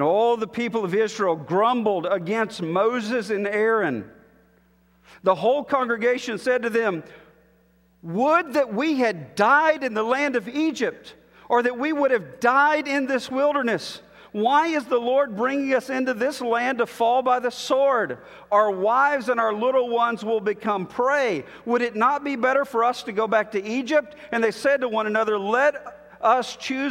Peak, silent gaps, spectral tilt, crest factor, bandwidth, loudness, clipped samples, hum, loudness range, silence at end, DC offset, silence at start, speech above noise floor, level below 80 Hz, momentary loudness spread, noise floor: -4 dBFS; none; -5 dB/octave; 18 dB; 16 kHz; -22 LUFS; under 0.1%; none; 3 LU; 0 s; under 0.1%; 0 s; 38 dB; -66 dBFS; 6 LU; -60 dBFS